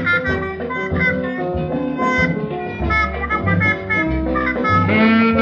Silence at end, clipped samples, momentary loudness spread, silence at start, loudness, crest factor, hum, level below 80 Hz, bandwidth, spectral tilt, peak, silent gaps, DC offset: 0 s; under 0.1%; 9 LU; 0 s; -18 LUFS; 16 dB; none; -32 dBFS; 7 kHz; -7.5 dB/octave; -2 dBFS; none; under 0.1%